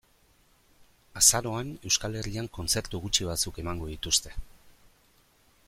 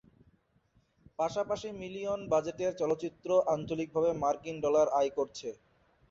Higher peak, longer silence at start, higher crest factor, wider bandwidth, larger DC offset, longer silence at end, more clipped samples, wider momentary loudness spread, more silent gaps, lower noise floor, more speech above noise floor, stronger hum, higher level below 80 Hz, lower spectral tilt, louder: first, -6 dBFS vs -16 dBFS; second, 0.8 s vs 1.2 s; first, 26 dB vs 18 dB; first, 16.5 kHz vs 7.8 kHz; neither; first, 0.95 s vs 0.55 s; neither; first, 15 LU vs 10 LU; neither; second, -64 dBFS vs -70 dBFS; second, 35 dB vs 39 dB; neither; first, -46 dBFS vs -66 dBFS; second, -2 dB/octave vs -5.5 dB/octave; first, -27 LUFS vs -32 LUFS